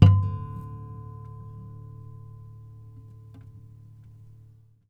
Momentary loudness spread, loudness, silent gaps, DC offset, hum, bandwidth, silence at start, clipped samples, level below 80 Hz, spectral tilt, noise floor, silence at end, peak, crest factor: 18 LU; -29 LUFS; none; under 0.1%; none; 5.2 kHz; 0 s; under 0.1%; -48 dBFS; -9.5 dB/octave; -53 dBFS; 3.2 s; 0 dBFS; 26 dB